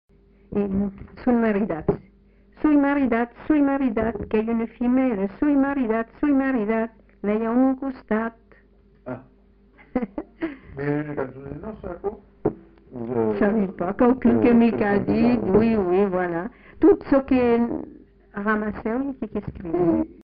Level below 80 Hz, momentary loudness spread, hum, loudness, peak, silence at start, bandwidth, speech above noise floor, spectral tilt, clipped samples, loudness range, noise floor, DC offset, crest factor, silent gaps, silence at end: -46 dBFS; 14 LU; none; -23 LUFS; -6 dBFS; 0.5 s; 5 kHz; 33 dB; -7.5 dB/octave; under 0.1%; 11 LU; -55 dBFS; under 0.1%; 16 dB; none; 0.1 s